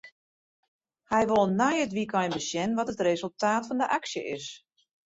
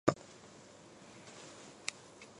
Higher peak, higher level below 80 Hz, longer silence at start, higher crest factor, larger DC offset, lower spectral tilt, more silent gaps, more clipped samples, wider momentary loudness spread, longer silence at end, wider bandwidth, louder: about the same, -10 dBFS vs -8 dBFS; first, -66 dBFS vs -72 dBFS; about the same, 0.05 s vs 0.05 s; second, 18 dB vs 34 dB; neither; about the same, -4.5 dB/octave vs -4.5 dB/octave; first, 0.12-0.79 s vs none; neither; second, 10 LU vs 13 LU; first, 0.5 s vs 0 s; second, 8 kHz vs 11 kHz; first, -28 LUFS vs -45 LUFS